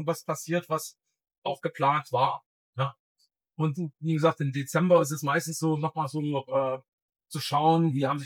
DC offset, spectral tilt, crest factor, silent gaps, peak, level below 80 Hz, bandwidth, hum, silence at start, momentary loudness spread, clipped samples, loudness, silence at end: under 0.1%; -6 dB/octave; 18 dB; 1.38-1.42 s, 2.46-2.73 s, 2.99-3.15 s, 6.88-7.09 s; -10 dBFS; -86 dBFS; 17.5 kHz; none; 0 s; 12 LU; under 0.1%; -28 LUFS; 0 s